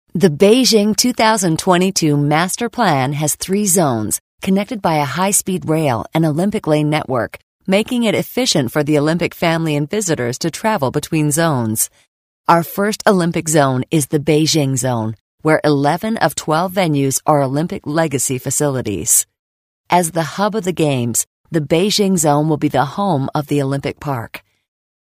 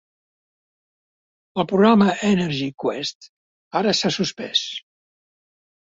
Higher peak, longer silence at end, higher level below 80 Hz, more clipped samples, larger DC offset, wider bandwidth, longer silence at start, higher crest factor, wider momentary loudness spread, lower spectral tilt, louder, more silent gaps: about the same, 0 dBFS vs -2 dBFS; second, 0.6 s vs 1.05 s; first, -52 dBFS vs -62 dBFS; neither; neither; first, 16 kHz vs 7.8 kHz; second, 0.15 s vs 1.55 s; second, 16 dB vs 22 dB; second, 7 LU vs 14 LU; about the same, -4.5 dB/octave vs -5 dB/octave; first, -16 LUFS vs -20 LUFS; first, 4.20-4.38 s, 7.43-7.59 s, 12.08-12.44 s, 15.21-15.38 s, 19.39-19.84 s, 21.27-21.44 s vs 3.15-3.21 s, 3.29-3.71 s